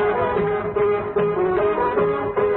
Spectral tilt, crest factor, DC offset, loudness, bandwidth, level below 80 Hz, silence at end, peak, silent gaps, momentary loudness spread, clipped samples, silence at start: -11.5 dB/octave; 10 dB; under 0.1%; -21 LUFS; 4.1 kHz; -46 dBFS; 0 s; -8 dBFS; none; 2 LU; under 0.1%; 0 s